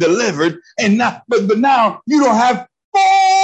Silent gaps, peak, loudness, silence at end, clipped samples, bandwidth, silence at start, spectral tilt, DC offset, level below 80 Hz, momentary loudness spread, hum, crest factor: 2.84-2.92 s; -2 dBFS; -14 LUFS; 0 s; under 0.1%; 8.8 kHz; 0 s; -4.5 dB/octave; under 0.1%; -62 dBFS; 7 LU; none; 12 dB